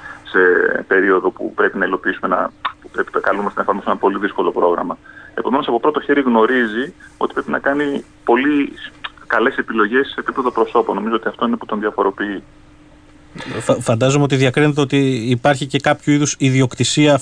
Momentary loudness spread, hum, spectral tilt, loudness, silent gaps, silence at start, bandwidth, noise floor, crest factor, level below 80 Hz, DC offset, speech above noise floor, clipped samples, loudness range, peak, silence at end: 10 LU; none; -5 dB/octave; -17 LUFS; none; 0 s; 10.5 kHz; -44 dBFS; 16 dB; -50 dBFS; under 0.1%; 28 dB; under 0.1%; 4 LU; -2 dBFS; 0 s